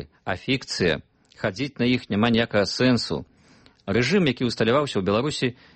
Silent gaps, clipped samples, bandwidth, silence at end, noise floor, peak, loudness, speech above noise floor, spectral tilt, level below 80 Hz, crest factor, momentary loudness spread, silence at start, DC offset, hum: none; under 0.1%; 8.8 kHz; 0.25 s; -55 dBFS; -8 dBFS; -23 LUFS; 32 dB; -5.5 dB/octave; -52 dBFS; 16 dB; 9 LU; 0 s; under 0.1%; none